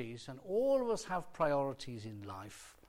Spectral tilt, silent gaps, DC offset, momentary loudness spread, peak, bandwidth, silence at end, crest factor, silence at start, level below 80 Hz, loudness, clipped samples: -5.5 dB/octave; none; under 0.1%; 15 LU; -20 dBFS; 16.5 kHz; 0.15 s; 16 dB; 0 s; -64 dBFS; -36 LUFS; under 0.1%